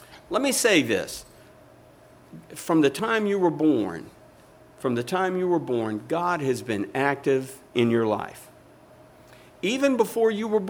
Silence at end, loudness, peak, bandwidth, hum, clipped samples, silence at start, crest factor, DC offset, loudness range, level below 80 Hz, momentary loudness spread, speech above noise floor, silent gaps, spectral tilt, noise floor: 0 s; -24 LUFS; -8 dBFS; over 20 kHz; none; under 0.1%; 0.1 s; 18 dB; under 0.1%; 2 LU; -64 dBFS; 10 LU; 28 dB; none; -4.5 dB/octave; -52 dBFS